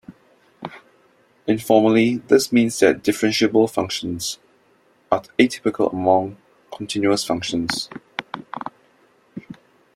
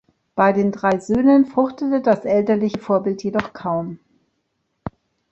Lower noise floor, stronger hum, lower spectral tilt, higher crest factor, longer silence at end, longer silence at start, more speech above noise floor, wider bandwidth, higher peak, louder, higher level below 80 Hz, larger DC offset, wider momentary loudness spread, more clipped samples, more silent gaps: second, -58 dBFS vs -72 dBFS; neither; second, -4.5 dB/octave vs -7.5 dB/octave; about the same, 20 dB vs 18 dB; about the same, 0.4 s vs 0.4 s; second, 0.1 s vs 0.35 s; second, 40 dB vs 54 dB; first, 16 kHz vs 8.2 kHz; about the same, -2 dBFS vs -2 dBFS; about the same, -20 LUFS vs -19 LUFS; second, -60 dBFS vs -54 dBFS; neither; first, 21 LU vs 18 LU; neither; neither